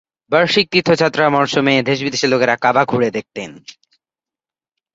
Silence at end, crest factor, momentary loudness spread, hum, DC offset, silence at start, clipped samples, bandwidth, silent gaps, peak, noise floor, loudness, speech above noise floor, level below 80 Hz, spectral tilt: 1.25 s; 16 dB; 10 LU; none; under 0.1%; 0.3 s; under 0.1%; 8 kHz; none; 0 dBFS; -90 dBFS; -15 LUFS; 74 dB; -58 dBFS; -4.5 dB/octave